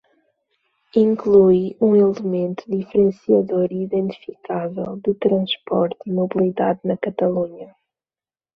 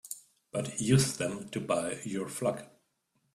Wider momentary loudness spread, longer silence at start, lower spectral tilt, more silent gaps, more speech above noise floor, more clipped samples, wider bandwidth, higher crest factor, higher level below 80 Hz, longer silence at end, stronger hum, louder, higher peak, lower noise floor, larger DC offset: second, 11 LU vs 15 LU; first, 0.95 s vs 0.05 s; first, -9 dB/octave vs -5 dB/octave; neither; first, over 71 dB vs 46 dB; neither; second, 6.2 kHz vs 15 kHz; about the same, 16 dB vs 20 dB; about the same, -60 dBFS vs -64 dBFS; first, 0.9 s vs 0.65 s; neither; first, -19 LUFS vs -32 LUFS; first, -2 dBFS vs -12 dBFS; first, under -90 dBFS vs -77 dBFS; neither